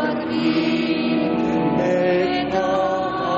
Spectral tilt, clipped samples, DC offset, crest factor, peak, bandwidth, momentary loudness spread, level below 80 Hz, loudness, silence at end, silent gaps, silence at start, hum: -4.5 dB/octave; under 0.1%; under 0.1%; 10 dB; -8 dBFS; 7.6 kHz; 3 LU; -50 dBFS; -20 LUFS; 0 s; none; 0 s; none